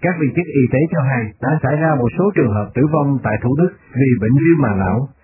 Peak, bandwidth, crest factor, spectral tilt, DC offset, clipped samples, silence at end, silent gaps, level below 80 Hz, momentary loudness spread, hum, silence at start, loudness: -2 dBFS; 2.9 kHz; 14 dB; -14 dB/octave; under 0.1%; under 0.1%; 0.15 s; none; -40 dBFS; 5 LU; none; 0 s; -16 LUFS